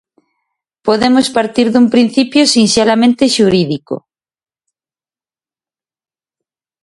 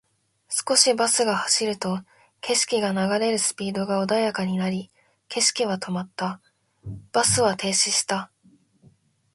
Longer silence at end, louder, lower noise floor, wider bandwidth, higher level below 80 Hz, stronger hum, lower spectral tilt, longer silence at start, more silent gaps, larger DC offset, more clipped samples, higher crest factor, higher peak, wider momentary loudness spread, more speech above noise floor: first, 2.85 s vs 1.1 s; first, -11 LUFS vs -22 LUFS; first, under -90 dBFS vs -59 dBFS; about the same, 11.5 kHz vs 12 kHz; first, -52 dBFS vs -60 dBFS; neither; first, -4 dB/octave vs -2.5 dB/octave; first, 0.85 s vs 0.5 s; neither; neither; neither; second, 14 dB vs 22 dB; about the same, 0 dBFS vs -2 dBFS; second, 10 LU vs 14 LU; first, over 79 dB vs 36 dB